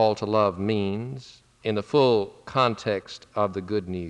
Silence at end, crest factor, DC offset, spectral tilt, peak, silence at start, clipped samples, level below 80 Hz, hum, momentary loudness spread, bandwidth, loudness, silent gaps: 0 s; 16 dB; under 0.1%; -6.5 dB/octave; -8 dBFS; 0 s; under 0.1%; -62 dBFS; none; 12 LU; 10 kHz; -25 LUFS; none